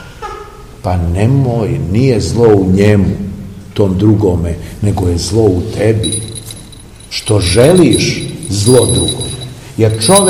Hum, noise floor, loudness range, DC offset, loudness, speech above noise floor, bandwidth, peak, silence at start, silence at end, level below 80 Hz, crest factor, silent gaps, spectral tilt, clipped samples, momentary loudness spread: none; -33 dBFS; 2 LU; 0.3%; -11 LUFS; 23 dB; over 20 kHz; 0 dBFS; 0 s; 0 s; -30 dBFS; 12 dB; none; -5.5 dB/octave; 0.9%; 16 LU